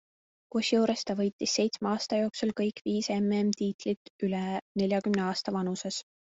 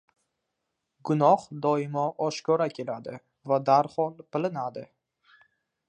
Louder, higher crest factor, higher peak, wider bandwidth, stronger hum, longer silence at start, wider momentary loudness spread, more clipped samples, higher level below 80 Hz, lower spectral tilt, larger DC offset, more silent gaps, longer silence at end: second, -30 LUFS vs -27 LUFS; about the same, 16 dB vs 20 dB; second, -14 dBFS vs -8 dBFS; second, 8 kHz vs 10 kHz; neither; second, 0.55 s vs 1.05 s; second, 6 LU vs 15 LU; neither; first, -70 dBFS vs -76 dBFS; second, -5 dB/octave vs -6.5 dB/octave; neither; first, 1.33-1.39 s, 2.81-2.85 s, 3.74-3.79 s, 3.97-4.19 s, 4.62-4.75 s vs none; second, 0.35 s vs 1.05 s